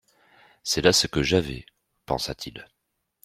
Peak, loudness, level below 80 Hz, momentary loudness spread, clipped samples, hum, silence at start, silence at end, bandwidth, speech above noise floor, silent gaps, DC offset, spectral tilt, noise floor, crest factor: -2 dBFS; -23 LUFS; -48 dBFS; 19 LU; under 0.1%; none; 0.65 s; 0.6 s; 16 kHz; 54 dB; none; under 0.1%; -3.5 dB/octave; -78 dBFS; 24 dB